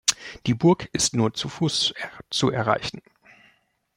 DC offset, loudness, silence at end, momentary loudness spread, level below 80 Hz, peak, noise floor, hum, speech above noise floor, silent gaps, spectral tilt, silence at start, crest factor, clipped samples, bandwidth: under 0.1%; -23 LUFS; 1 s; 10 LU; -56 dBFS; -2 dBFS; -64 dBFS; none; 40 dB; none; -4 dB/octave; 0.05 s; 24 dB; under 0.1%; 16.5 kHz